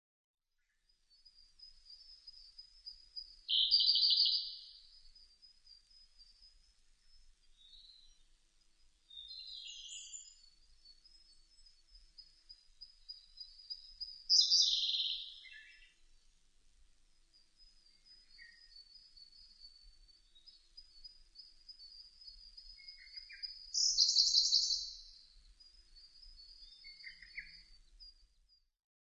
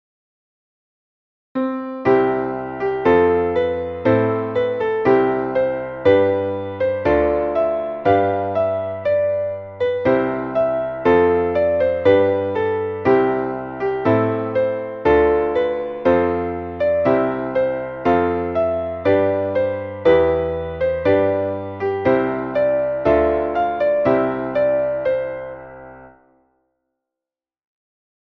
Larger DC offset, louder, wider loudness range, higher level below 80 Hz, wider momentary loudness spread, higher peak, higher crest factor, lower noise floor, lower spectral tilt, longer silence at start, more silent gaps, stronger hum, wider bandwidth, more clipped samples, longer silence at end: neither; second, -31 LUFS vs -19 LUFS; first, 23 LU vs 3 LU; second, -70 dBFS vs -44 dBFS; first, 29 LU vs 8 LU; second, -16 dBFS vs -2 dBFS; first, 26 dB vs 16 dB; second, -81 dBFS vs -89 dBFS; second, 5 dB/octave vs -9 dB/octave; about the same, 1.6 s vs 1.55 s; neither; neither; first, 10 kHz vs 6 kHz; neither; second, 0.95 s vs 2.25 s